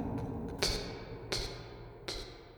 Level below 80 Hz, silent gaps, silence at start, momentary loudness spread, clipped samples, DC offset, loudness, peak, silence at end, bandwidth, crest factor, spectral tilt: -48 dBFS; none; 0 s; 12 LU; under 0.1%; under 0.1%; -38 LUFS; -12 dBFS; 0 s; over 20 kHz; 28 dB; -3.5 dB/octave